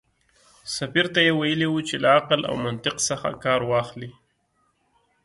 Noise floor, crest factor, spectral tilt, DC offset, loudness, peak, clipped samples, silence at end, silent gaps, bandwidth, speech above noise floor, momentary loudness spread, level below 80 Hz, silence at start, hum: -69 dBFS; 20 dB; -3.5 dB/octave; under 0.1%; -22 LUFS; -4 dBFS; under 0.1%; 1.15 s; none; 11.5 kHz; 46 dB; 14 LU; -58 dBFS; 0.65 s; none